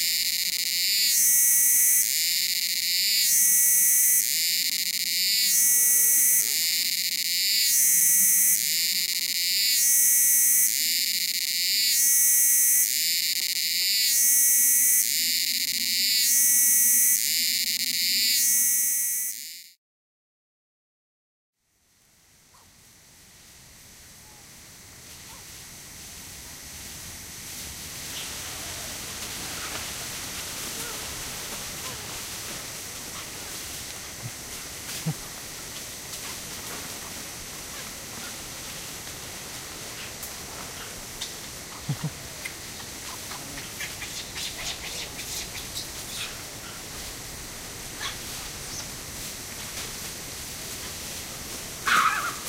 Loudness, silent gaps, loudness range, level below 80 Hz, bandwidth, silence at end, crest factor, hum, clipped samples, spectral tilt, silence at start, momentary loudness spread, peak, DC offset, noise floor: -21 LUFS; 19.78-21.53 s; 16 LU; -54 dBFS; 17 kHz; 0 s; 20 dB; none; under 0.1%; 1 dB/octave; 0 s; 19 LU; -6 dBFS; under 0.1%; -66 dBFS